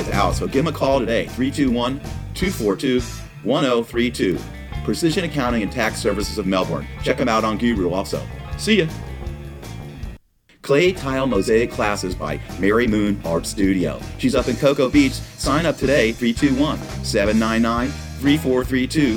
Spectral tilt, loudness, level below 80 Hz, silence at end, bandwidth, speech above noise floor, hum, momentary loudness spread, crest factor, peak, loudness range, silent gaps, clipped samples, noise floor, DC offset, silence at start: -5.5 dB/octave; -20 LUFS; -34 dBFS; 0 s; 18.5 kHz; 30 dB; none; 11 LU; 18 dB; -2 dBFS; 3 LU; none; under 0.1%; -49 dBFS; under 0.1%; 0 s